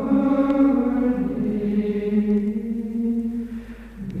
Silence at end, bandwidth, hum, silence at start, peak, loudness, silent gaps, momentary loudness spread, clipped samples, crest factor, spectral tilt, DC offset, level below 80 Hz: 0 s; 4.8 kHz; none; 0 s; -8 dBFS; -22 LUFS; none; 15 LU; under 0.1%; 14 dB; -9.5 dB/octave; under 0.1%; -44 dBFS